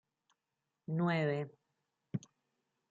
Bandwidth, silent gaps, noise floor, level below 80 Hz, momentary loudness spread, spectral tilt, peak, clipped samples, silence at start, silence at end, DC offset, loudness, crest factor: 7.4 kHz; none; -88 dBFS; -84 dBFS; 14 LU; -8 dB/octave; -22 dBFS; under 0.1%; 0.9 s; 0.7 s; under 0.1%; -37 LUFS; 18 dB